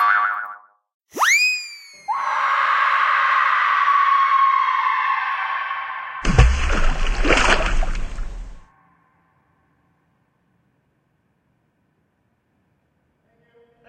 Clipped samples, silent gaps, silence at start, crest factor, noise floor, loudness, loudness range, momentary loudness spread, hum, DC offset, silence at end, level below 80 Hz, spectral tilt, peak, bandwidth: under 0.1%; 0.94-1.00 s; 0 s; 20 dB; -67 dBFS; -18 LUFS; 7 LU; 17 LU; none; under 0.1%; 5.3 s; -26 dBFS; -3.5 dB/octave; -2 dBFS; 15.5 kHz